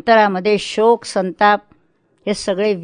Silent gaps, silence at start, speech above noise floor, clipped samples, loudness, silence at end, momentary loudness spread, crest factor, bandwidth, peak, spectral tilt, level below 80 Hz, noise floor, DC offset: none; 0.05 s; 44 dB; under 0.1%; -16 LUFS; 0 s; 9 LU; 16 dB; 10.5 kHz; 0 dBFS; -4.5 dB/octave; -54 dBFS; -59 dBFS; under 0.1%